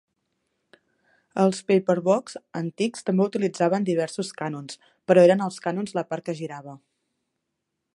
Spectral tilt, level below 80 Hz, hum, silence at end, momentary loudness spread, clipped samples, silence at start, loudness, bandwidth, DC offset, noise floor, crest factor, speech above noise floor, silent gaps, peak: -6 dB/octave; -76 dBFS; none; 1.15 s; 17 LU; under 0.1%; 1.35 s; -24 LUFS; 11.5 kHz; under 0.1%; -81 dBFS; 20 dB; 57 dB; none; -4 dBFS